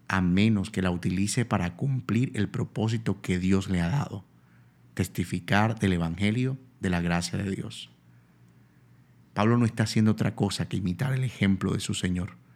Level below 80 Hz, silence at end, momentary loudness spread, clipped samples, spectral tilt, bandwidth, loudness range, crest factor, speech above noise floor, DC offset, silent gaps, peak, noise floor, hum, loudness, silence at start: -54 dBFS; 0.25 s; 9 LU; under 0.1%; -6 dB/octave; 15 kHz; 3 LU; 22 dB; 31 dB; under 0.1%; none; -6 dBFS; -57 dBFS; none; -27 LUFS; 0.1 s